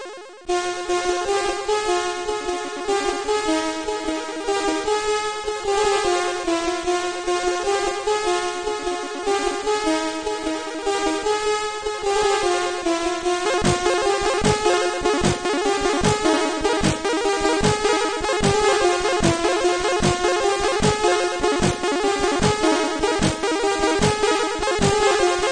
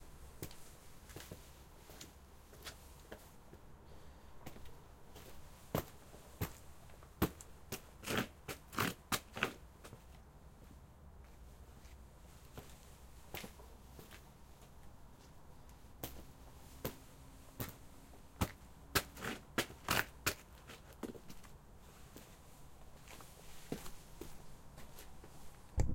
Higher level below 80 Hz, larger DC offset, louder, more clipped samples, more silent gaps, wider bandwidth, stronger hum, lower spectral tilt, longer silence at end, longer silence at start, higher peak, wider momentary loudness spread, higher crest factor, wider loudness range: first, -40 dBFS vs -56 dBFS; first, 0.2% vs under 0.1%; first, -21 LUFS vs -45 LUFS; neither; neither; second, 9.8 kHz vs 16.5 kHz; neither; about the same, -3.5 dB/octave vs -3.5 dB/octave; about the same, 0 s vs 0 s; about the same, 0 s vs 0 s; first, -6 dBFS vs -16 dBFS; second, 6 LU vs 20 LU; second, 16 dB vs 30 dB; second, 4 LU vs 15 LU